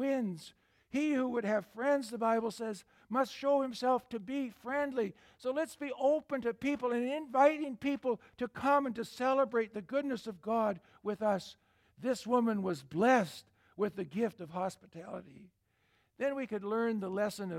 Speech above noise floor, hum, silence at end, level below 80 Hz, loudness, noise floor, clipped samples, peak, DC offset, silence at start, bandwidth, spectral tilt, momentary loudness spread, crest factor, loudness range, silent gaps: 41 dB; none; 0 s; -74 dBFS; -34 LUFS; -74 dBFS; under 0.1%; -14 dBFS; under 0.1%; 0 s; 16 kHz; -5.5 dB/octave; 11 LU; 20 dB; 4 LU; none